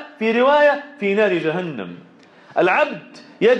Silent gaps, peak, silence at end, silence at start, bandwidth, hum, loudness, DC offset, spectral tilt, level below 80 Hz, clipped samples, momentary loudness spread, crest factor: none; -6 dBFS; 0 s; 0 s; 8.4 kHz; none; -18 LUFS; under 0.1%; -6.5 dB/octave; -70 dBFS; under 0.1%; 15 LU; 14 dB